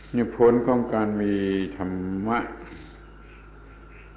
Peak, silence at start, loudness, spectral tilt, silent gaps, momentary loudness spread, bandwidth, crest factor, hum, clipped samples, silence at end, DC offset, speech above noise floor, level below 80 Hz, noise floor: -8 dBFS; 0 s; -24 LUFS; -11.5 dB/octave; none; 18 LU; 4 kHz; 18 dB; none; under 0.1%; 0 s; under 0.1%; 22 dB; -46 dBFS; -46 dBFS